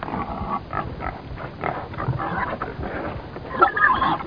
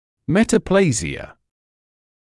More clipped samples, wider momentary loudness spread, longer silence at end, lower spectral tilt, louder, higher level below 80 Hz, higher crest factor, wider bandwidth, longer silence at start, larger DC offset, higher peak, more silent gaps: neither; about the same, 14 LU vs 12 LU; second, 0 s vs 1.15 s; first, -8.5 dB/octave vs -5.5 dB/octave; second, -24 LUFS vs -18 LUFS; about the same, -40 dBFS vs -44 dBFS; first, 24 dB vs 18 dB; second, 5.2 kHz vs 12 kHz; second, 0 s vs 0.3 s; first, 0.2% vs under 0.1%; about the same, -2 dBFS vs -4 dBFS; neither